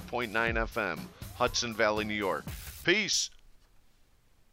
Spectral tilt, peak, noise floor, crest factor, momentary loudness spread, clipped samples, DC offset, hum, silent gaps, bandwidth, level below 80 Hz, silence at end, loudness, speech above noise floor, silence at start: -2.5 dB/octave; -10 dBFS; -64 dBFS; 22 dB; 10 LU; under 0.1%; under 0.1%; none; none; 16 kHz; -48 dBFS; 0.95 s; -30 LUFS; 33 dB; 0 s